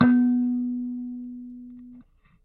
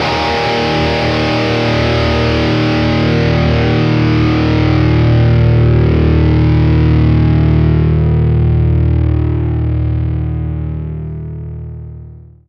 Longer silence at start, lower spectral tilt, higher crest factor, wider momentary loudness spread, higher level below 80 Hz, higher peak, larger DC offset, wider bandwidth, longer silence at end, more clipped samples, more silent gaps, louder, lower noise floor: about the same, 0 s vs 0 s; first, -11 dB/octave vs -8 dB/octave; first, 20 dB vs 12 dB; first, 23 LU vs 11 LU; second, -58 dBFS vs -22 dBFS; second, -6 dBFS vs 0 dBFS; neither; second, 4 kHz vs 6.8 kHz; first, 0.45 s vs 0.3 s; neither; neither; second, -25 LUFS vs -12 LUFS; first, -53 dBFS vs -34 dBFS